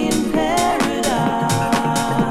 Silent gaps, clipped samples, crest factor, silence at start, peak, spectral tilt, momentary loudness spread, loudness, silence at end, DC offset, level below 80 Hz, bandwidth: none; under 0.1%; 14 dB; 0 s; -4 dBFS; -4.5 dB/octave; 1 LU; -18 LUFS; 0 s; under 0.1%; -38 dBFS; 17.5 kHz